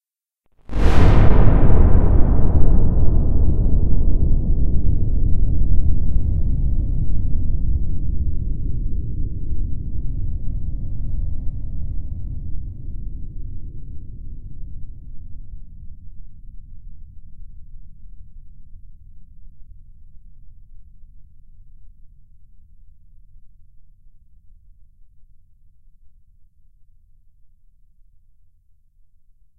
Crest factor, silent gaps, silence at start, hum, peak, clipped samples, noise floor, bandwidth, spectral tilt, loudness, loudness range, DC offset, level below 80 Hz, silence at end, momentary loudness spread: 16 dB; none; 0.7 s; none; 0 dBFS; under 0.1%; -68 dBFS; 3.7 kHz; -9.5 dB/octave; -22 LUFS; 24 LU; under 0.1%; -22 dBFS; 5.75 s; 25 LU